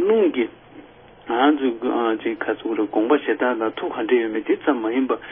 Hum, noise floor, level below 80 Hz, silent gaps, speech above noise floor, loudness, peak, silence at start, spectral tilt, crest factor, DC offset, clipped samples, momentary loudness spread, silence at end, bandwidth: none; -45 dBFS; -64 dBFS; none; 24 dB; -21 LUFS; -4 dBFS; 0 s; -9.5 dB/octave; 16 dB; under 0.1%; under 0.1%; 7 LU; 0 s; 3.7 kHz